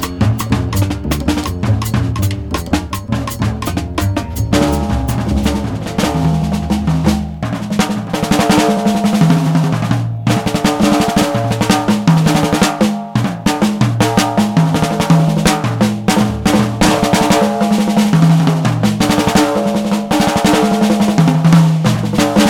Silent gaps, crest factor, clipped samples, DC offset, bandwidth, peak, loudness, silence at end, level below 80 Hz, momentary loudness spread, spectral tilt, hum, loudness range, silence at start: none; 14 dB; under 0.1%; under 0.1%; 19.5 kHz; 0 dBFS; -14 LUFS; 0 s; -28 dBFS; 7 LU; -5.5 dB/octave; none; 5 LU; 0 s